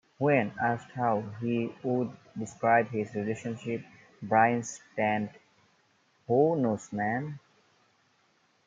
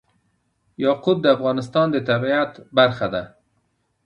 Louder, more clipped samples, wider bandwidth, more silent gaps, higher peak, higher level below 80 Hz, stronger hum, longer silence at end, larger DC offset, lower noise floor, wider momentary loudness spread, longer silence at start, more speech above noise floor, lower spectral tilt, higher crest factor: second, -29 LUFS vs -20 LUFS; neither; about the same, 9.2 kHz vs 10 kHz; neither; second, -10 dBFS vs -2 dBFS; second, -74 dBFS vs -58 dBFS; neither; first, 1.3 s vs 0.8 s; neither; about the same, -69 dBFS vs -69 dBFS; first, 13 LU vs 8 LU; second, 0.2 s vs 0.8 s; second, 40 dB vs 49 dB; about the same, -6.5 dB/octave vs -7 dB/octave; about the same, 22 dB vs 20 dB